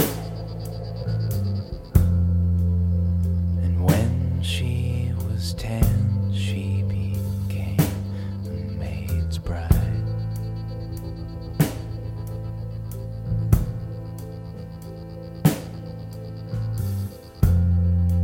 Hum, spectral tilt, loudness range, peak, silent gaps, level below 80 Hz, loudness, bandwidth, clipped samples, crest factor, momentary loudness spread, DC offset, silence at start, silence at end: none; -7 dB/octave; 7 LU; -4 dBFS; none; -32 dBFS; -25 LUFS; 17 kHz; under 0.1%; 20 dB; 13 LU; under 0.1%; 0 s; 0 s